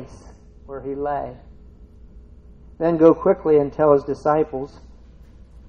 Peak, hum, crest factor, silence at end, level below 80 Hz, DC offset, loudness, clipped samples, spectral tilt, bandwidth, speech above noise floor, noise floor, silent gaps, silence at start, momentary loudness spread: 0 dBFS; none; 20 dB; 0.1 s; -46 dBFS; under 0.1%; -19 LUFS; under 0.1%; -9 dB/octave; 6.8 kHz; 26 dB; -45 dBFS; none; 0 s; 20 LU